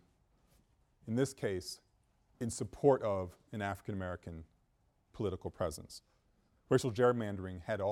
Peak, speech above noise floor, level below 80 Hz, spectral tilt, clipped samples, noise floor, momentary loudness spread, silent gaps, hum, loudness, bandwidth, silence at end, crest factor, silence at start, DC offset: -14 dBFS; 39 dB; -62 dBFS; -6 dB/octave; under 0.1%; -74 dBFS; 18 LU; none; none; -36 LUFS; 16 kHz; 0 s; 22 dB; 1.05 s; under 0.1%